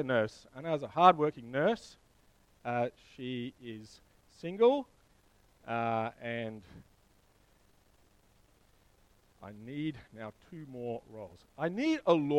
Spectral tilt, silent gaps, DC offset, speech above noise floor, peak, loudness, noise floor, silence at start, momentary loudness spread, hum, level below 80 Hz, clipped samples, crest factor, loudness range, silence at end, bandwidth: -6.5 dB/octave; none; under 0.1%; 34 dB; -8 dBFS; -33 LUFS; -66 dBFS; 0 s; 22 LU; none; -68 dBFS; under 0.1%; 28 dB; 15 LU; 0 s; 11 kHz